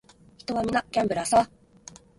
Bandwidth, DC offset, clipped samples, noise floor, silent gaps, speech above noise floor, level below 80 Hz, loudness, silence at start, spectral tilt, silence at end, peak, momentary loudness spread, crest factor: 11.5 kHz; under 0.1%; under 0.1%; -50 dBFS; none; 26 dB; -56 dBFS; -25 LUFS; 0.5 s; -4 dB/octave; 0.75 s; -8 dBFS; 21 LU; 20 dB